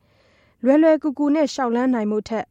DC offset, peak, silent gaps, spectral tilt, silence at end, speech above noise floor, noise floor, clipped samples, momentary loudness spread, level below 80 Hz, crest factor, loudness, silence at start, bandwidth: under 0.1%; -6 dBFS; none; -5.5 dB/octave; 0.05 s; 39 dB; -58 dBFS; under 0.1%; 8 LU; -60 dBFS; 14 dB; -19 LUFS; 0.65 s; 8.4 kHz